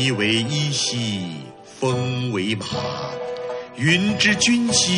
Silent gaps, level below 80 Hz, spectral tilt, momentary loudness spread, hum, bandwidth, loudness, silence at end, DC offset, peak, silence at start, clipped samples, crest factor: none; -54 dBFS; -3.5 dB/octave; 13 LU; none; 11 kHz; -21 LUFS; 0 s; under 0.1%; -2 dBFS; 0 s; under 0.1%; 20 dB